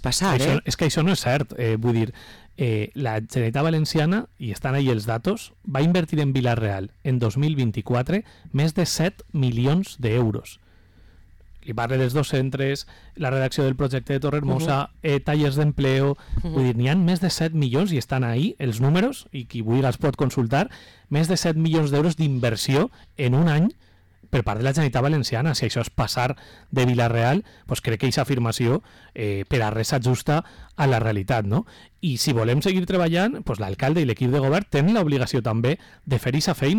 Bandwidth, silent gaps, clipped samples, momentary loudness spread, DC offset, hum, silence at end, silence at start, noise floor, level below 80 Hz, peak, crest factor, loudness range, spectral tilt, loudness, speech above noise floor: 18 kHz; none; under 0.1%; 7 LU; under 0.1%; none; 0 s; 0 s; -51 dBFS; -44 dBFS; -14 dBFS; 8 dB; 2 LU; -6 dB/octave; -23 LUFS; 29 dB